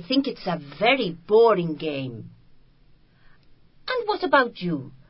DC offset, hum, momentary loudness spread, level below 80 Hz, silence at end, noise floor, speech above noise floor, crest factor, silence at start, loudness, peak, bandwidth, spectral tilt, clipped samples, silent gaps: under 0.1%; none; 13 LU; -60 dBFS; 0.2 s; -55 dBFS; 32 dB; 20 dB; 0 s; -23 LUFS; -4 dBFS; 5.8 kHz; -10 dB/octave; under 0.1%; none